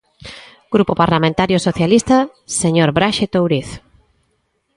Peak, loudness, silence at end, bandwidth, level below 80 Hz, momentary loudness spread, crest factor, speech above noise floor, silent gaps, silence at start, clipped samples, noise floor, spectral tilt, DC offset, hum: 0 dBFS; -15 LUFS; 1 s; 11.5 kHz; -44 dBFS; 20 LU; 16 dB; 51 dB; none; 0.25 s; under 0.1%; -66 dBFS; -5 dB/octave; under 0.1%; none